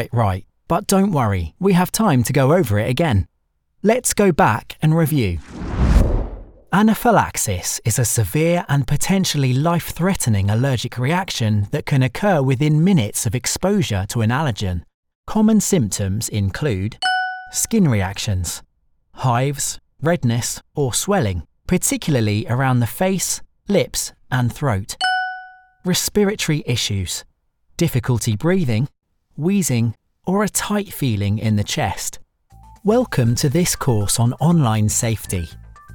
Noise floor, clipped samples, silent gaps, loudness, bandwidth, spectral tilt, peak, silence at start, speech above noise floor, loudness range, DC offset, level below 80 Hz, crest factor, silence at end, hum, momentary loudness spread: -65 dBFS; under 0.1%; 14.94-15.03 s, 15.15-15.23 s; -19 LUFS; 19.5 kHz; -5 dB/octave; -2 dBFS; 0 s; 47 dB; 3 LU; under 0.1%; -34 dBFS; 16 dB; 0 s; none; 8 LU